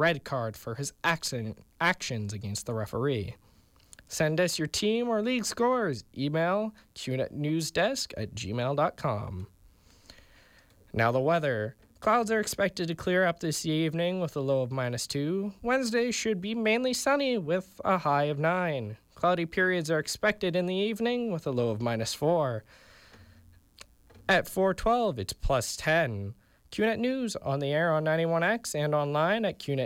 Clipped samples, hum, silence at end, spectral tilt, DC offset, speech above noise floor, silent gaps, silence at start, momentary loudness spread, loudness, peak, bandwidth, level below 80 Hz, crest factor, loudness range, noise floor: under 0.1%; none; 0 s; -4.5 dB/octave; under 0.1%; 32 dB; none; 0 s; 8 LU; -29 LUFS; -14 dBFS; 16.5 kHz; -52 dBFS; 16 dB; 4 LU; -60 dBFS